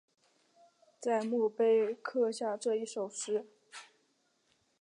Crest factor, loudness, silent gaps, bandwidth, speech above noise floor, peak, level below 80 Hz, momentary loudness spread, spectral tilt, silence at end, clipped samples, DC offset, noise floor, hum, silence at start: 16 dB; -33 LUFS; none; 10.5 kHz; 43 dB; -20 dBFS; under -90 dBFS; 22 LU; -4 dB/octave; 1 s; under 0.1%; under 0.1%; -75 dBFS; none; 1 s